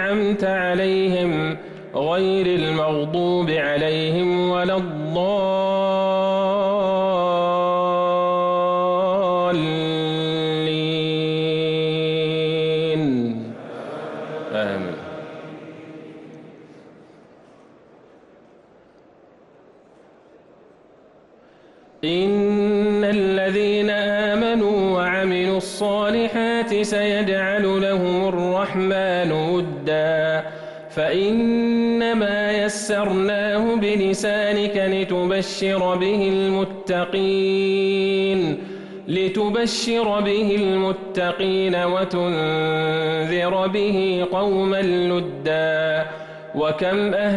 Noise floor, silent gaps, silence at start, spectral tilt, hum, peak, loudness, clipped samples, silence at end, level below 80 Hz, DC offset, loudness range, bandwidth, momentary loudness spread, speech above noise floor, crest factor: -51 dBFS; none; 0 s; -5.5 dB/octave; none; -12 dBFS; -21 LUFS; under 0.1%; 0 s; -54 dBFS; under 0.1%; 4 LU; 12 kHz; 6 LU; 31 dB; 10 dB